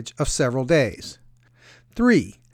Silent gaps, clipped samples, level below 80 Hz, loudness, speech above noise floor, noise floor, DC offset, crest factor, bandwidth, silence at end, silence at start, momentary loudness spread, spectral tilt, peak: none; under 0.1%; -40 dBFS; -21 LUFS; 32 dB; -53 dBFS; under 0.1%; 16 dB; 15.5 kHz; 0.25 s; 0 s; 19 LU; -5 dB/octave; -6 dBFS